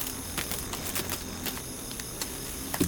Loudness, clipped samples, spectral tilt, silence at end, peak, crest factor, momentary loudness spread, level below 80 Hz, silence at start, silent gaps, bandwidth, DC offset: -33 LUFS; under 0.1%; -3 dB/octave; 0 s; -10 dBFS; 24 dB; 5 LU; -48 dBFS; 0 s; none; 19 kHz; under 0.1%